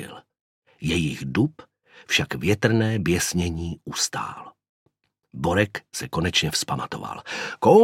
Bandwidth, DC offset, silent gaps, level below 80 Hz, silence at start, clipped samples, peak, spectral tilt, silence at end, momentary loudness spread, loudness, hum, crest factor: 16.5 kHz; under 0.1%; 0.41-0.62 s, 4.69-4.86 s; -48 dBFS; 0 s; under 0.1%; -2 dBFS; -4.5 dB/octave; 0 s; 11 LU; -24 LUFS; none; 22 dB